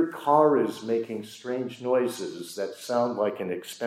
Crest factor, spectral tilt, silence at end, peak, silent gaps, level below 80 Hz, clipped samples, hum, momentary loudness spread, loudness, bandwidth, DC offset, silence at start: 20 dB; -5.5 dB/octave; 0 s; -8 dBFS; none; -80 dBFS; under 0.1%; none; 14 LU; -27 LUFS; 16 kHz; under 0.1%; 0 s